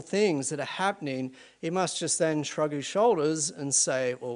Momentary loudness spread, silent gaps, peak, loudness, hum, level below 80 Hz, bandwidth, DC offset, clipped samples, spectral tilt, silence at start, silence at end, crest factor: 9 LU; none; -12 dBFS; -27 LUFS; none; -76 dBFS; 10.5 kHz; under 0.1%; under 0.1%; -3.5 dB/octave; 0 s; 0 s; 16 dB